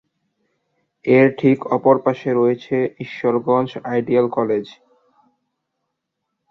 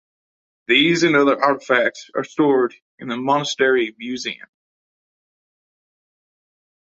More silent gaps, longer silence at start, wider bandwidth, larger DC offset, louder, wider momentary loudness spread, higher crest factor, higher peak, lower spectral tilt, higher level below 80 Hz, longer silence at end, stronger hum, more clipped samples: second, none vs 2.82-2.98 s; first, 1.05 s vs 0.7 s; second, 6.4 kHz vs 8 kHz; neither; about the same, -18 LUFS vs -18 LUFS; second, 9 LU vs 14 LU; about the same, 18 dB vs 18 dB; about the same, -2 dBFS vs -2 dBFS; first, -9 dB/octave vs -4 dB/octave; about the same, -64 dBFS vs -68 dBFS; second, 1.8 s vs 2.55 s; neither; neither